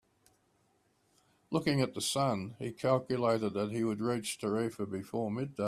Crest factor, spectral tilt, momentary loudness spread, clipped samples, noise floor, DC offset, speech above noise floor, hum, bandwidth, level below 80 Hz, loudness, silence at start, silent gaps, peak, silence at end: 20 dB; -5.5 dB/octave; 6 LU; under 0.1%; -73 dBFS; under 0.1%; 40 dB; none; 14.5 kHz; -70 dBFS; -33 LUFS; 1.5 s; none; -14 dBFS; 0 s